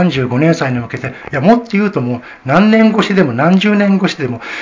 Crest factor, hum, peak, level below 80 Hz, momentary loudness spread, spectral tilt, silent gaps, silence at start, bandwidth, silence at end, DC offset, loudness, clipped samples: 12 dB; none; 0 dBFS; -48 dBFS; 11 LU; -7 dB/octave; none; 0 s; 7.6 kHz; 0 s; under 0.1%; -12 LUFS; 0.3%